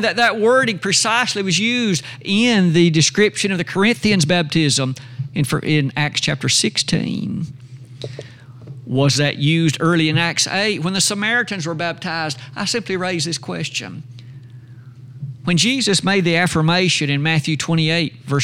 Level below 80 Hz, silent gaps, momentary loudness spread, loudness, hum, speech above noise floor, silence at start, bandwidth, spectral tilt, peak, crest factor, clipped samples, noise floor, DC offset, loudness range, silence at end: -54 dBFS; none; 12 LU; -17 LUFS; none; 21 dB; 0 s; 16 kHz; -4 dB/octave; -2 dBFS; 16 dB; under 0.1%; -39 dBFS; under 0.1%; 6 LU; 0 s